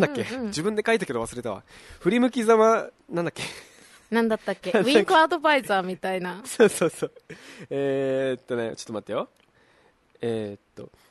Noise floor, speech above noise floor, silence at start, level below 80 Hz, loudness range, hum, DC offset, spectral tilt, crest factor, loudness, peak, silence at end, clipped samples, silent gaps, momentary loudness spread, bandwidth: -61 dBFS; 37 dB; 0 s; -62 dBFS; 8 LU; none; under 0.1%; -4.5 dB/octave; 20 dB; -24 LUFS; -4 dBFS; 0.25 s; under 0.1%; none; 16 LU; 12.5 kHz